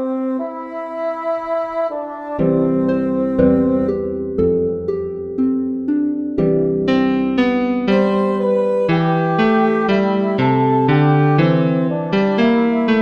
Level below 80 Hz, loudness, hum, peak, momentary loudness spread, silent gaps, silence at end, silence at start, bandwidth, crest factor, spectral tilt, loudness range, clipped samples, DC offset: -44 dBFS; -17 LUFS; none; 0 dBFS; 8 LU; none; 0 s; 0 s; 6.6 kHz; 16 dB; -9 dB/octave; 3 LU; under 0.1%; under 0.1%